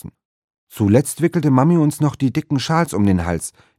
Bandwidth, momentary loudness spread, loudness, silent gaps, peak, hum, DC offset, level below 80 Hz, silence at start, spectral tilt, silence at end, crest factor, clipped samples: 16 kHz; 7 LU; -17 LUFS; 0.25-0.48 s, 0.58-0.67 s; 0 dBFS; none; under 0.1%; -44 dBFS; 0.05 s; -6.5 dB/octave; 0.3 s; 16 dB; under 0.1%